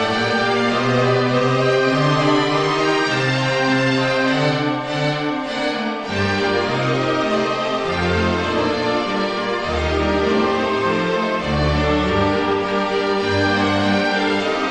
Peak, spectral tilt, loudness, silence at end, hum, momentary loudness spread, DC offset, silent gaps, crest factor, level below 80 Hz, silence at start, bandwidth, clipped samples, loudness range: -2 dBFS; -5.5 dB/octave; -18 LUFS; 0 s; none; 4 LU; under 0.1%; none; 16 dB; -36 dBFS; 0 s; 10 kHz; under 0.1%; 3 LU